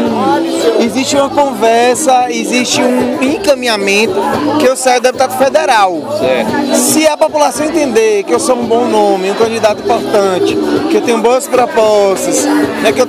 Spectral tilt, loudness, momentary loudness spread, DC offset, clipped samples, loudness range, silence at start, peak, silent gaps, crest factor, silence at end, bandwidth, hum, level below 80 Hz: -3 dB/octave; -11 LUFS; 3 LU; under 0.1%; 0.2%; 1 LU; 0 s; 0 dBFS; none; 10 dB; 0 s; 16.5 kHz; none; -48 dBFS